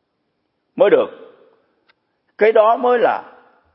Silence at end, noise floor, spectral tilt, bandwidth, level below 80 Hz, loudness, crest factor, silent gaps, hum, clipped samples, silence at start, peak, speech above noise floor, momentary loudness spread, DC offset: 0.5 s; -70 dBFS; -9.5 dB/octave; 5.6 kHz; -78 dBFS; -15 LUFS; 18 dB; none; none; under 0.1%; 0.75 s; 0 dBFS; 56 dB; 13 LU; under 0.1%